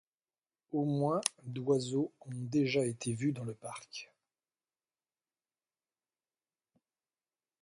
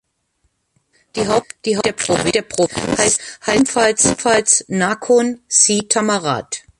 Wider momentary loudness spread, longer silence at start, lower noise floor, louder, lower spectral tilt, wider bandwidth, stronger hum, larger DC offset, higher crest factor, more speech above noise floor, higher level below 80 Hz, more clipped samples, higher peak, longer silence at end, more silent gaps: first, 13 LU vs 7 LU; second, 0.7 s vs 1.15 s; first, under -90 dBFS vs -66 dBFS; second, -35 LUFS vs -16 LUFS; first, -5.5 dB/octave vs -2.5 dB/octave; about the same, 11.5 kHz vs 11.5 kHz; neither; neither; first, 30 dB vs 18 dB; first, over 56 dB vs 50 dB; second, -78 dBFS vs -48 dBFS; neither; second, -8 dBFS vs 0 dBFS; first, 3.55 s vs 0.2 s; neither